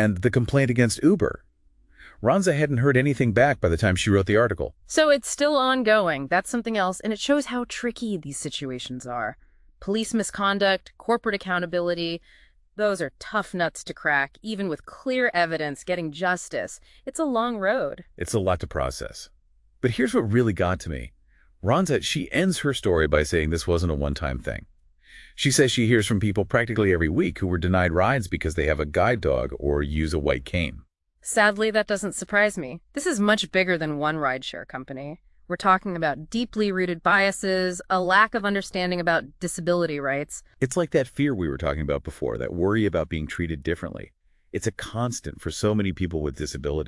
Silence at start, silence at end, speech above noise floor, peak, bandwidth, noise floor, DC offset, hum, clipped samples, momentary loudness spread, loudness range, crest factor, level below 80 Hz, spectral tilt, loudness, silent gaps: 0 s; 0 s; 35 dB; -4 dBFS; 12 kHz; -59 dBFS; under 0.1%; none; under 0.1%; 11 LU; 6 LU; 20 dB; -42 dBFS; -5 dB/octave; -24 LUFS; none